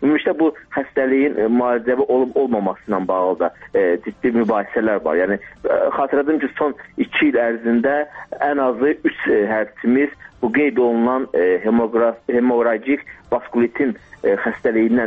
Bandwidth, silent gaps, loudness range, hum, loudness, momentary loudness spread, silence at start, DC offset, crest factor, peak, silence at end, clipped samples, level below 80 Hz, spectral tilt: 4.5 kHz; none; 1 LU; none; -19 LUFS; 6 LU; 0 s; under 0.1%; 12 dB; -6 dBFS; 0 s; under 0.1%; -56 dBFS; -8.5 dB/octave